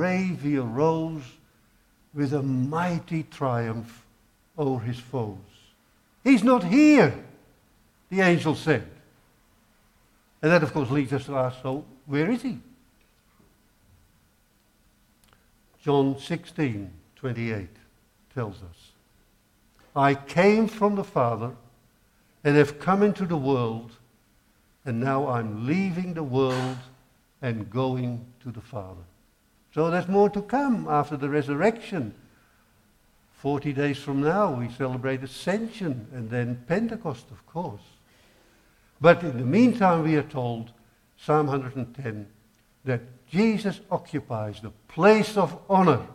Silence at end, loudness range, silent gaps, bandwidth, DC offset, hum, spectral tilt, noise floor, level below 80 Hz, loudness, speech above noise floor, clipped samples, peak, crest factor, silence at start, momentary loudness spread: 0 s; 9 LU; none; 14 kHz; under 0.1%; none; -7.5 dB/octave; -64 dBFS; -58 dBFS; -25 LUFS; 40 dB; under 0.1%; -4 dBFS; 22 dB; 0 s; 17 LU